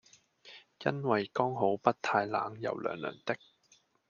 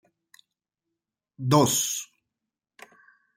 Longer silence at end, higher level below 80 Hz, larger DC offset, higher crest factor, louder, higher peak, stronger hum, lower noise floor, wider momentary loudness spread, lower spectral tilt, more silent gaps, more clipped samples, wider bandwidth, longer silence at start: second, 0.75 s vs 1.35 s; second, -78 dBFS vs -68 dBFS; neither; about the same, 24 dB vs 24 dB; second, -33 LUFS vs -23 LUFS; second, -10 dBFS vs -6 dBFS; neither; second, -68 dBFS vs -87 dBFS; second, 11 LU vs 15 LU; first, -6.5 dB/octave vs -4 dB/octave; neither; neither; second, 7.2 kHz vs 16.5 kHz; second, 0.45 s vs 1.4 s